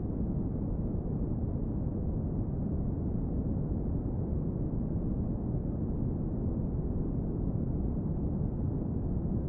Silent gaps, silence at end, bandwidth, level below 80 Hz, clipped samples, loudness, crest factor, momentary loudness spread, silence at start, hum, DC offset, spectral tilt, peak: none; 0 s; 2.2 kHz; -38 dBFS; under 0.1%; -34 LUFS; 12 dB; 1 LU; 0 s; none; under 0.1%; -15 dB/octave; -20 dBFS